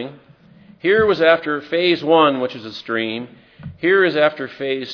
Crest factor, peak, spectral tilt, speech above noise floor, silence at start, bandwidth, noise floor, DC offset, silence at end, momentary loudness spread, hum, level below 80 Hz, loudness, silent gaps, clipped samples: 18 dB; 0 dBFS; -6.5 dB/octave; 29 dB; 0 s; 5.4 kHz; -47 dBFS; under 0.1%; 0 s; 17 LU; none; -58 dBFS; -17 LUFS; none; under 0.1%